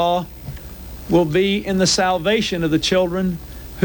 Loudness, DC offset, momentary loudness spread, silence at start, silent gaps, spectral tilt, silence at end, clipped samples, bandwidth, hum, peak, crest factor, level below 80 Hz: -18 LUFS; under 0.1%; 18 LU; 0 s; none; -4.5 dB/octave; 0 s; under 0.1%; 17.5 kHz; none; -2 dBFS; 16 dB; -38 dBFS